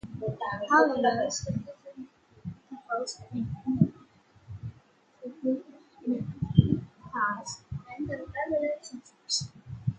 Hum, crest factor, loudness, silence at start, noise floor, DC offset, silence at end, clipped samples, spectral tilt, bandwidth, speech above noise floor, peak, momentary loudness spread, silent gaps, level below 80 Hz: none; 28 dB; -30 LUFS; 0.05 s; -61 dBFS; under 0.1%; 0 s; under 0.1%; -5.5 dB/octave; 9.4 kHz; 32 dB; -4 dBFS; 21 LU; none; -52 dBFS